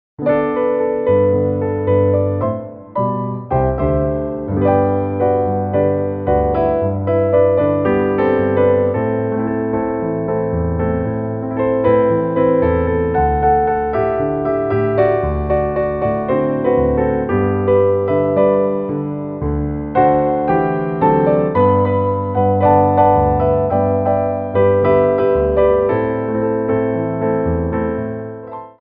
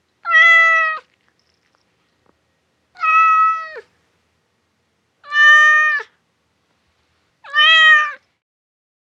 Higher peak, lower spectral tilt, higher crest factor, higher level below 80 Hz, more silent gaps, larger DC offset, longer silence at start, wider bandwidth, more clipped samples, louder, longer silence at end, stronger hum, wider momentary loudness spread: about the same, -2 dBFS vs 0 dBFS; first, -12.5 dB/octave vs 3.5 dB/octave; about the same, 14 dB vs 16 dB; first, -32 dBFS vs -78 dBFS; neither; neither; about the same, 0.2 s vs 0.25 s; second, 3.8 kHz vs 8 kHz; neither; second, -16 LUFS vs -11 LUFS; second, 0.1 s vs 0.95 s; neither; second, 6 LU vs 15 LU